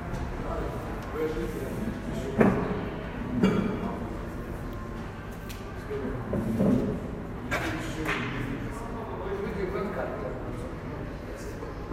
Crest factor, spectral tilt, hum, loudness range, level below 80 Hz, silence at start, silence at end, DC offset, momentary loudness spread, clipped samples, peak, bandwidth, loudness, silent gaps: 24 dB; -7 dB/octave; none; 5 LU; -40 dBFS; 0 s; 0 s; under 0.1%; 12 LU; under 0.1%; -6 dBFS; 16 kHz; -31 LUFS; none